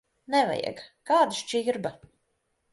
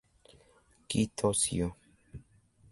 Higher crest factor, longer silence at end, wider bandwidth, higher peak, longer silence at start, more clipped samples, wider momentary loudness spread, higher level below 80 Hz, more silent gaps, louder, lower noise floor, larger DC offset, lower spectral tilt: about the same, 18 dB vs 22 dB; first, 0.75 s vs 0.5 s; about the same, 11.5 kHz vs 12 kHz; first, -10 dBFS vs -14 dBFS; second, 0.3 s vs 0.9 s; neither; second, 13 LU vs 24 LU; second, -70 dBFS vs -54 dBFS; neither; first, -27 LUFS vs -31 LUFS; first, -75 dBFS vs -65 dBFS; neither; about the same, -3.5 dB/octave vs -4 dB/octave